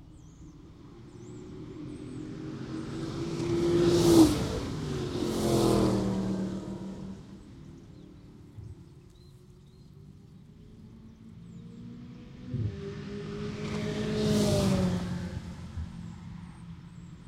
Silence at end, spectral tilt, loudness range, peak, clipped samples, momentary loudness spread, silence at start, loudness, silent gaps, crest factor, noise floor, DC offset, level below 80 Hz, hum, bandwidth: 0 s; -6 dB/octave; 24 LU; -8 dBFS; under 0.1%; 25 LU; 0 s; -29 LUFS; none; 24 dB; -53 dBFS; under 0.1%; -48 dBFS; none; 16.5 kHz